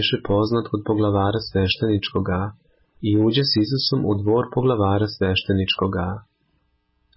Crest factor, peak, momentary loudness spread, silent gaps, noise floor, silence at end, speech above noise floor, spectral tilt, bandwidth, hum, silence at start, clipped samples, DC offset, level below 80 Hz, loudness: 14 dB; -8 dBFS; 6 LU; none; -67 dBFS; 0.95 s; 47 dB; -10 dB/octave; 5.8 kHz; none; 0 s; under 0.1%; under 0.1%; -40 dBFS; -21 LUFS